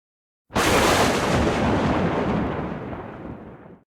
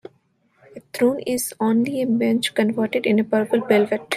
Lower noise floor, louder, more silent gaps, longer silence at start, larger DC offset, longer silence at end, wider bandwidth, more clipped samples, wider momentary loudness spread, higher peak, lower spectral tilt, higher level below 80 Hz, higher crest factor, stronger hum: second, -42 dBFS vs -63 dBFS; about the same, -21 LUFS vs -20 LUFS; neither; second, 0.5 s vs 0.75 s; neither; first, 0.2 s vs 0 s; first, 17.5 kHz vs 15 kHz; neither; first, 18 LU vs 4 LU; second, -8 dBFS vs -4 dBFS; about the same, -4.5 dB/octave vs -5 dB/octave; first, -38 dBFS vs -66 dBFS; about the same, 16 dB vs 18 dB; neither